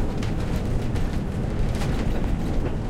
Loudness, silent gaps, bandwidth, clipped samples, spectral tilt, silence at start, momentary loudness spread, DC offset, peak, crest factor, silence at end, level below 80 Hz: -27 LUFS; none; 13.5 kHz; under 0.1%; -7 dB/octave; 0 s; 2 LU; under 0.1%; -10 dBFS; 12 dB; 0 s; -26 dBFS